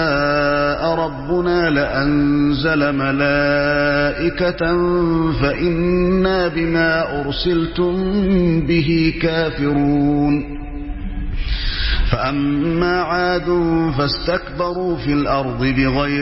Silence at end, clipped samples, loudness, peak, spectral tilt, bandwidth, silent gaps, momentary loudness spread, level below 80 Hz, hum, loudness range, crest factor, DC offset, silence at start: 0 s; under 0.1%; -17 LUFS; -2 dBFS; -10 dB/octave; 5.8 kHz; none; 5 LU; -28 dBFS; none; 3 LU; 16 dB; 0.1%; 0 s